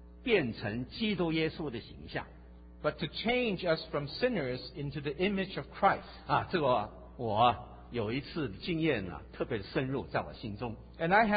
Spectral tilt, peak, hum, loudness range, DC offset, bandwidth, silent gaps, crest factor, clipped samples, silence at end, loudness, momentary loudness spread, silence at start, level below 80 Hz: -4 dB/octave; -12 dBFS; none; 3 LU; under 0.1%; 4.9 kHz; none; 20 dB; under 0.1%; 0 s; -33 LUFS; 12 LU; 0 s; -54 dBFS